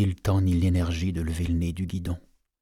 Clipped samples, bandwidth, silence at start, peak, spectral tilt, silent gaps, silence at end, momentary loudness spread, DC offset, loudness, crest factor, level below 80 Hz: under 0.1%; 13.5 kHz; 0 s; -14 dBFS; -7 dB/octave; none; 0.4 s; 9 LU; under 0.1%; -27 LUFS; 12 dB; -38 dBFS